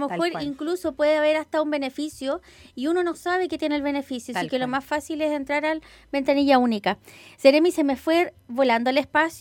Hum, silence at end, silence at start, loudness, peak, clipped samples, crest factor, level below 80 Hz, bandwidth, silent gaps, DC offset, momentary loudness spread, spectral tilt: none; 0 s; 0 s; -23 LUFS; -2 dBFS; under 0.1%; 20 dB; -58 dBFS; 17.5 kHz; none; under 0.1%; 11 LU; -4.5 dB/octave